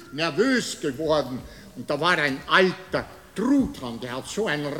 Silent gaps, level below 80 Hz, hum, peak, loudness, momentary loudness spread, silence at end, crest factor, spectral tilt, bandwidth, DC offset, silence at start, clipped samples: none; -52 dBFS; none; -4 dBFS; -24 LUFS; 14 LU; 0 s; 20 dB; -4.5 dB/octave; 17 kHz; 0.1%; 0 s; under 0.1%